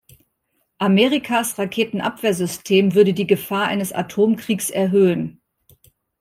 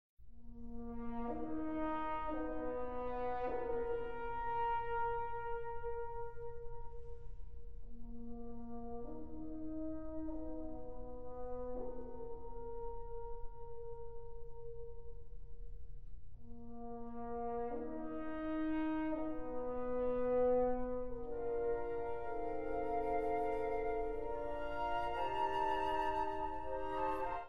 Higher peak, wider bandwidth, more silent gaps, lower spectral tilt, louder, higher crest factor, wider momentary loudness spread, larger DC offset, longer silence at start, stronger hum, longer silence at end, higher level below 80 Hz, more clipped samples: first, -2 dBFS vs -24 dBFS; first, 16 kHz vs 6.6 kHz; second, none vs 0.09-0.17 s; second, -5 dB/octave vs -7.5 dB/octave; first, -19 LUFS vs -41 LUFS; about the same, 18 dB vs 16 dB; second, 8 LU vs 17 LU; second, under 0.1% vs 0.6%; first, 0.8 s vs 0.1 s; neither; first, 0.9 s vs 0 s; second, -62 dBFS vs -52 dBFS; neither